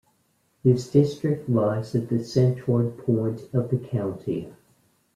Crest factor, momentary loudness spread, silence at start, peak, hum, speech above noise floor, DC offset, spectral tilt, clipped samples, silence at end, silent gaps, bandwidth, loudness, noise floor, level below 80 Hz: 18 dB; 8 LU; 0.65 s; -6 dBFS; none; 44 dB; under 0.1%; -8.5 dB/octave; under 0.1%; 0.65 s; none; 11 kHz; -24 LUFS; -68 dBFS; -60 dBFS